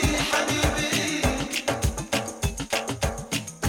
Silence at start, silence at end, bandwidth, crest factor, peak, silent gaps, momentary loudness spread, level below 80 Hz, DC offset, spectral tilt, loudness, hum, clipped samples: 0 s; 0 s; 19 kHz; 18 dB; -8 dBFS; none; 7 LU; -36 dBFS; under 0.1%; -3.5 dB/octave; -25 LUFS; none; under 0.1%